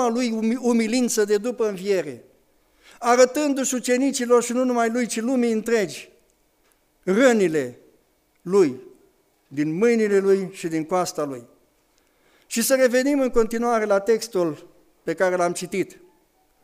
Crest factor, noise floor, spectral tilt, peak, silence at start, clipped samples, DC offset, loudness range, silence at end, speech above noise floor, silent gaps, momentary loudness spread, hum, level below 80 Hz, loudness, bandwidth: 18 dB; -63 dBFS; -4 dB/octave; -4 dBFS; 0 s; under 0.1%; under 0.1%; 3 LU; 0.7 s; 43 dB; none; 12 LU; none; -52 dBFS; -22 LUFS; 15.5 kHz